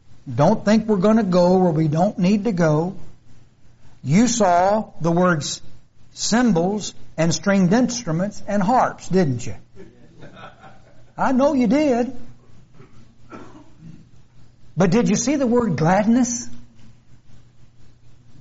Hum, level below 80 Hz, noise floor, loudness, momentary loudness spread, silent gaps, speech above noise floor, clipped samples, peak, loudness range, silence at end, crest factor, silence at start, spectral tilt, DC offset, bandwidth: none; -50 dBFS; -43 dBFS; -19 LUFS; 12 LU; none; 25 dB; under 0.1%; -4 dBFS; 5 LU; 0 s; 16 dB; 0.1 s; -6 dB/octave; under 0.1%; 8 kHz